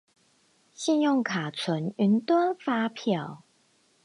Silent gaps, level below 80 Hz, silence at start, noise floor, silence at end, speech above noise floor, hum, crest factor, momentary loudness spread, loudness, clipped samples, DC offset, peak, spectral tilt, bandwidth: none; -78 dBFS; 0.8 s; -66 dBFS; 0.7 s; 40 dB; none; 14 dB; 7 LU; -27 LUFS; under 0.1%; under 0.1%; -12 dBFS; -5.5 dB/octave; 11.5 kHz